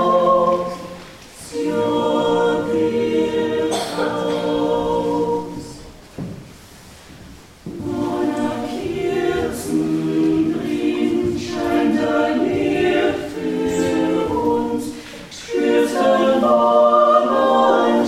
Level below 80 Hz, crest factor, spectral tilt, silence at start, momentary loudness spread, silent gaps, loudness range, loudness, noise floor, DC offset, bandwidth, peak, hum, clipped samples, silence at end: -48 dBFS; 16 dB; -5.5 dB/octave; 0 s; 18 LU; none; 9 LU; -18 LUFS; -42 dBFS; under 0.1%; 15.5 kHz; -2 dBFS; none; under 0.1%; 0 s